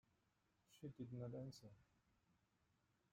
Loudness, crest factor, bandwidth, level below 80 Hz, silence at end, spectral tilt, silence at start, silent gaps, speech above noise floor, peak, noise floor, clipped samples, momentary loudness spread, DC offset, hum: -55 LUFS; 20 dB; 16 kHz; -84 dBFS; 1.3 s; -7.5 dB/octave; 0.7 s; none; 30 dB; -40 dBFS; -85 dBFS; under 0.1%; 11 LU; under 0.1%; none